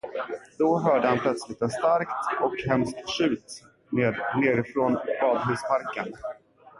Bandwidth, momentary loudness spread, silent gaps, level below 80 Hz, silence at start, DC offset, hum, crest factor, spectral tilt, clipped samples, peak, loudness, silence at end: 11.5 kHz; 11 LU; none; -60 dBFS; 0.05 s; under 0.1%; none; 18 dB; -6 dB/octave; under 0.1%; -8 dBFS; -26 LUFS; 0 s